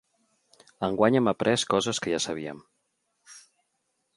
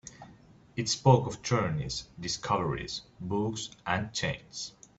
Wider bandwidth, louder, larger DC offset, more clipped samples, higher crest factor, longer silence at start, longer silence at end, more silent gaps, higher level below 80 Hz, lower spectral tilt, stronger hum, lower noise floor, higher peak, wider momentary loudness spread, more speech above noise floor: first, 11.5 kHz vs 8 kHz; first, -26 LUFS vs -31 LUFS; neither; neither; about the same, 22 dB vs 24 dB; first, 0.8 s vs 0.05 s; first, 0.75 s vs 0.3 s; neither; second, -64 dBFS vs -56 dBFS; about the same, -4 dB/octave vs -4.5 dB/octave; neither; first, -77 dBFS vs -56 dBFS; about the same, -6 dBFS vs -8 dBFS; about the same, 13 LU vs 14 LU; first, 51 dB vs 26 dB